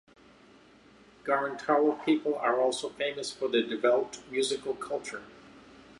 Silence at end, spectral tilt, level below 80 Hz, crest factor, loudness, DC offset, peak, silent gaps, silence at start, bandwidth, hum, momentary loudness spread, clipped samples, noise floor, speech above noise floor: 0.4 s; -3.5 dB/octave; -72 dBFS; 20 dB; -29 LUFS; under 0.1%; -12 dBFS; none; 1.25 s; 11.5 kHz; none; 9 LU; under 0.1%; -57 dBFS; 28 dB